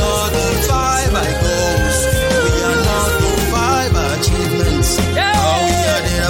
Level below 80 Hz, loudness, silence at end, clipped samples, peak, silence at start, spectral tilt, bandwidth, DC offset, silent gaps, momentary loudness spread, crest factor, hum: -22 dBFS; -15 LUFS; 0 s; under 0.1%; -2 dBFS; 0 s; -4 dB/octave; 17 kHz; under 0.1%; none; 2 LU; 12 dB; none